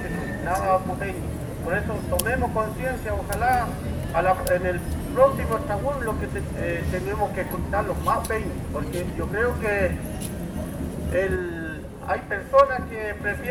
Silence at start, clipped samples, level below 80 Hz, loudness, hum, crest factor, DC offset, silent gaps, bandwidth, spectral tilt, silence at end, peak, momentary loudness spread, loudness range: 0 s; under 0.1%; -36 dBFS; -25 LUFS; none; 22 dB; under 0.1%; none; 19.5 kHz; -6 dB/octave; 0 s; -4 dBFS; 10 LU; 3 LU